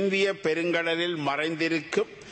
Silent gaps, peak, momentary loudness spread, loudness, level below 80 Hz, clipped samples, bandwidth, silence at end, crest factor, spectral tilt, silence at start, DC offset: none; -12 dBFS; 3 LU; -27 LUFS; -70 dBFS; under 0.1%; 8.8 kHz; 0 s; 14 dB; -4.5 dB/octave; 0 s; under 0.1%